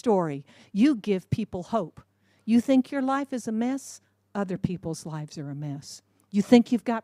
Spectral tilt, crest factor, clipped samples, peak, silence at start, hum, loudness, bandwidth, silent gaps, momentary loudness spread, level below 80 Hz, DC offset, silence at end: -6.5 dB/octave; 22 dB; under 0.1%; -4 dBFS; 0.05 s; none; -26 LUFS; 13 kHz; none; 18 LU; -60 dBFS; under 0.1%; 0.05 s